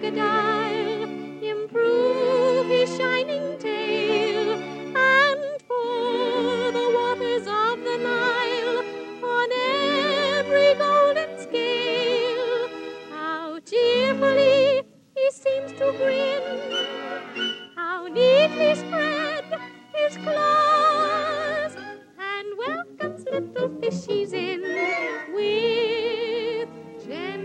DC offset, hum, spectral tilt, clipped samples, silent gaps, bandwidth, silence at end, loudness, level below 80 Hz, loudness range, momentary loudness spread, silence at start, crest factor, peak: under 0.1%; none; -4 dB/octave; under 0.1%; none; 9.4 kHz; 0 s; -23 LUFS; -78 dBFS; 4 LU; 13 LU; 0 s; 16 dB; -8 dBFS